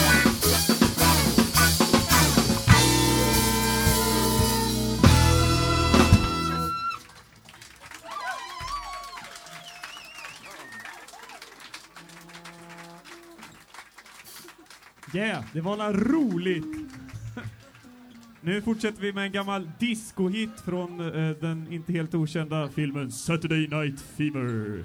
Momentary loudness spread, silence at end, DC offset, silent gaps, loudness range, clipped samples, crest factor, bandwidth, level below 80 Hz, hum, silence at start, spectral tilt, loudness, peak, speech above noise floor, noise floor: 24 LU; 0 s; under 0.1%; none; 22 LU; under 0.1%; 24 dB; over 20 kHz; -38 dBFS; none; 0 s; -4 dB/octave; -24 LUFS; -2 dBFS; 23 dB; -51 dBFS